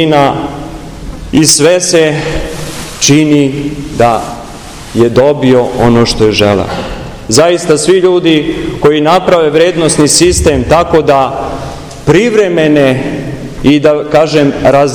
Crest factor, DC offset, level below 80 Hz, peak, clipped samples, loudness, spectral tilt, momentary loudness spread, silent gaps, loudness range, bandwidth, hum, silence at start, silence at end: 8 dB; under 0.1%; -28 dBFS; 0 dBFS; 4%; -8 LUFS; -4.5 dB/octave; 14 LU; none; 2 LU; over 20 kHz; none; 0 s; 0 s